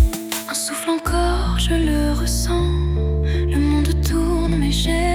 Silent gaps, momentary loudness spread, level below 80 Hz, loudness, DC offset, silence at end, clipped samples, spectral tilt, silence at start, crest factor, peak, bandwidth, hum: none; 3 LU; -22 dBFS; -20 LUFS; under 0.1%; 0 s; under 0.1%; -5 dB/octave; 0 s; 14 dB; -4 dBFS; 18.5 kHz; none